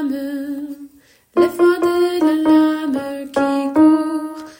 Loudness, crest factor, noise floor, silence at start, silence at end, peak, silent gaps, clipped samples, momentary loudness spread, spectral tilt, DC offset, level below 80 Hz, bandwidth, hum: -17 LUFS; 14 dB; -49 dBFS; 0 s; 0.05 s; -2 dBFS; none; under 0.1%; 12 LU; -5 dB/octave; under 0.1%; -60 dBFS; 16.5 kHz; none